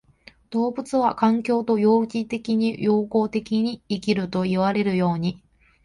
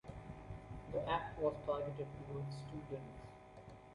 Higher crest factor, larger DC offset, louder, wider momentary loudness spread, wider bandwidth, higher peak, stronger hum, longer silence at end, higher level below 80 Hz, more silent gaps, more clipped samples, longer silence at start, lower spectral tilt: about the same, 16 dB vs 20 dB; neither; first, -23 LUFS vs -44 LUFS; second, 7 LU vs 17 LU; about the same, 11 kHz vs 11.5 kHz; first, -6 dBFS vs -24 dBFS; neither; first, 0.5 s vs 0 s; about the same, -58 dBFS vs -60 dBFS; neither; neither; first, 0.5 s vs 0.05 s; about the same, -7.5 dB/octave vs -7.5 dB/octave